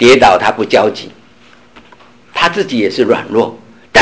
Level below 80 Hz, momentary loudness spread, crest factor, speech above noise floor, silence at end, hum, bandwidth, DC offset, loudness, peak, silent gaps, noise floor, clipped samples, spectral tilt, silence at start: -44 dBFS; 13 LU; 12 dB; 33 dB; 0 s; none; 8 kHz; under 0.1%; -12 LUFS; 0 dBFS; none; -44 dBFS; under 0.1%; -4 dB/octave; 0 s